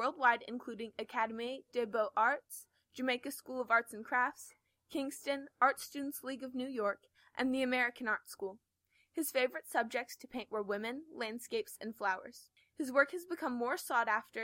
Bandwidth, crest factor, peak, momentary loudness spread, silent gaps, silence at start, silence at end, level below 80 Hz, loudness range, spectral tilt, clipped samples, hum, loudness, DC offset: 16.5 kHz; 22 dB; -14 dBFS; 13 LU; none; 0 s; 0 s; -82 dBFS; 3 LU; -2.5 dB/octave; under 0.1%; none; -36 LUFS; under 0.1%